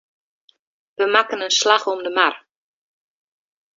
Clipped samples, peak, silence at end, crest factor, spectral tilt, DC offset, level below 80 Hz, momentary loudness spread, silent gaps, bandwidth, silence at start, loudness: under 0.1%; 0 dBFS; 1.4 s; 22 dB; 0 dB/octave; under 0.1%; -74 dBFS; 7 LU; none; 8 kHz; 1 s; -18 LUFS